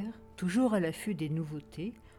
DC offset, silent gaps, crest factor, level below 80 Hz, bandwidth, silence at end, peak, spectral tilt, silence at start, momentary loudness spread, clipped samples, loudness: under 0.1%; none; 16 dB; -62 dBFS; 18.5 kHz; 0 s; -18 dBFS; -6.5 dB/octave; 0 s; 13 LU; under 0.1%; -33 LUFS